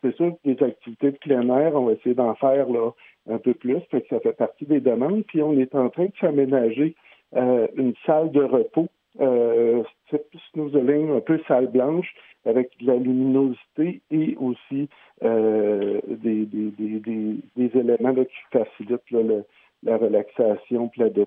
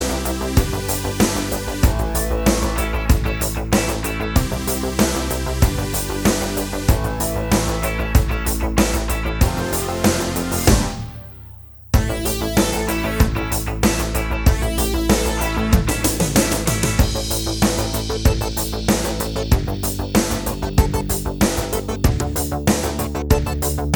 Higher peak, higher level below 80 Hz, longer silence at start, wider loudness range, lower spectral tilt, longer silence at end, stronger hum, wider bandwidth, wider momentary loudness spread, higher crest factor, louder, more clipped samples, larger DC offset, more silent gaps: second, -6 dBFS vs 0 dBFS; second, -82 dBFS vs -24 dBFS; about the same, 0.05 s vs 0 s; about the same, 2 LU vs 2 LU; first, -11.5 dB/octave vs -4.5 dB/octave; about the same, 0 s vs 0 s; neither; second, 3.7 kHz vs over 20 kHz; first, 8 LU vs 5 LU; about the same, 16 dB vs 18 dB; about the same, -22 LUFS vs -20 LUFS; neither; neither; neither